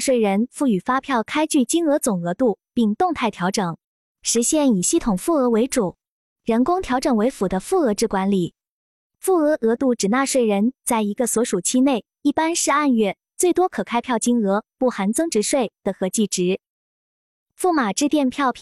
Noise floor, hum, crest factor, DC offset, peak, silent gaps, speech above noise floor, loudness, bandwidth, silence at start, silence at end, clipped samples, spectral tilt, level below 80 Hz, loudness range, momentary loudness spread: under -90 dBFS; none; 14 dB; under 0.1%; -6 dBFS; 3.84-4.15 s, 6.08-6.36 s, 8.68-9.10 s, 16.69-17.46 s; over 70 dB; -20 LUFS; 14 kHz; 0 s; 0 s; under 0.1%; -4.5 dB/octave; -52 dBFS; 2 LU; 5 LU